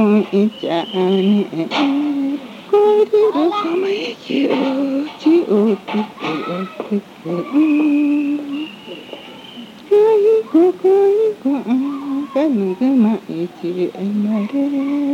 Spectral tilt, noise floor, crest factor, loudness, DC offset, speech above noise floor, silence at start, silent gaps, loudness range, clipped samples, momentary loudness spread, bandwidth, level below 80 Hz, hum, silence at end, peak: -7.5 dB/octave; -35 dBFS; 14 dB; -17 LUFS; under 0.1%; 20 dB; 0 s; none; 4 LU; under 0.1%; 12 LU; 9.4 kHz; -70 dBFS; none; 0 s; -4 dBFS